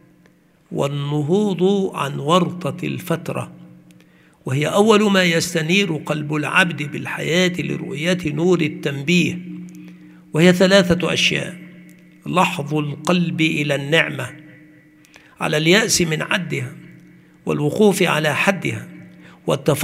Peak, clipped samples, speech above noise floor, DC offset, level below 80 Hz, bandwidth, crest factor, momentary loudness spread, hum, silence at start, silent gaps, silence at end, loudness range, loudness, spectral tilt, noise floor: 0 dBFS; under 0.1%; 36 dB; under 0.1%; -54 dBFS; 16 kHz; 20 dB; 15 LU; none; 0.7 s; none; 0 s; 3 LU; -18 LUFS; -4.5 dB/octave; -54 dBFS